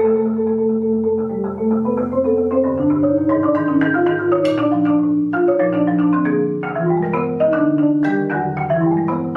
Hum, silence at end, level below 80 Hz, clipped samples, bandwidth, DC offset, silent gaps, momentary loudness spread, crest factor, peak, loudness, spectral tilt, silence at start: none; 0 s; -54 dBFS; under 0.1%; 5.6 kHz; under 0.1%; none; 3 LU; 12 dB; -4 dBFS; -17 LUFS; -9.5 dB/octave; 0 s